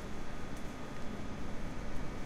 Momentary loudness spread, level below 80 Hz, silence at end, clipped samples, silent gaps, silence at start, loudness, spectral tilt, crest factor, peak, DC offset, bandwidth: 1 LU; -44 dBFS; 0 s; under 0.1%; none; 0 s; -45 LUFS; -5.5 dB/octave; 12 dB; -24 dBFS; under 0.1%; 11.5 kHz